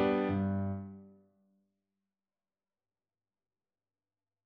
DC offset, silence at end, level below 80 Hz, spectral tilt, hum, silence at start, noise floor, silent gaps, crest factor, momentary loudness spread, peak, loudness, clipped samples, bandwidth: under 0.1%; 3.35 s; -70 dBFS; -10 dB/octave; none; 0 s; under -90 dBFS; none; 20 dB; 19 LU; -18 dBFS; -34 LUFS; under 0.1%; 5.2 kHz